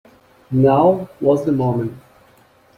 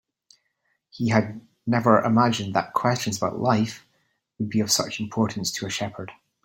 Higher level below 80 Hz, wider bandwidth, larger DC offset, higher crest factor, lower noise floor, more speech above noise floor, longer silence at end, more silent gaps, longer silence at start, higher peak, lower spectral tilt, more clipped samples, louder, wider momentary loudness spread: first, -54 dBFS vs -60 dBFS; second, 14.5 kHz vs 16.5 kHz; neither; second, 16 dB vs 22 dB; second, -52 dBFS vs -73 dBFS; second, 36 dB vs 50 dB; first, 0.8 s vs 0.3 s; neither; second, 0.5 s vs 0.95 s; about the same, -2 dBFS vs -2 dBFS; first, -9.5 dB/octave vs -4.5 dB/octave; neither; first, -17 LUFS vs -24 LUFS; second, 10 LU vs 14 LU